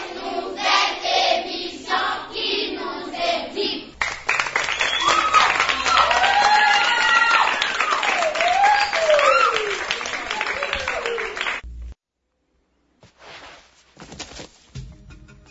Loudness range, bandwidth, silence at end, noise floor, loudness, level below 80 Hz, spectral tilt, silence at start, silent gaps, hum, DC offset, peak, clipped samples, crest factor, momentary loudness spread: 11 LU; 8 kHz; 0.15 s; -74 dBFS; -19 LUFS; -48 dBFS; -1 dB/octave; 0 s; none; none; under 0.1%; -2 dBFS; under 0.1%; 18 dB; 14 LU